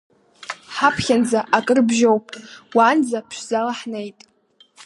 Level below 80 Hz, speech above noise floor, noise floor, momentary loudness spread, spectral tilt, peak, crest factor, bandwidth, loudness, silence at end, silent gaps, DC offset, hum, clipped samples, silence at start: -56 dBFS; 37 dB; -55 dBFS; 18 LU; -4 dB/octave; -2 dBFS; 18 dB; 11.5 kHz; -19 LUFS; 0.75 s; none; under 0.1%; none; under 0.1%; 0.4 s